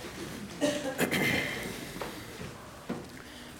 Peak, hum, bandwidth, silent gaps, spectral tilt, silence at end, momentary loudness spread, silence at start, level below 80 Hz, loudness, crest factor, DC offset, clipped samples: -14 dBFS; none; 17 kHz; none; -4 dB/octave; 0 s; 16 LU; 0 s; -58 dBFS; -33 LUFS; 22 dB; under 0.1%; under 0.1%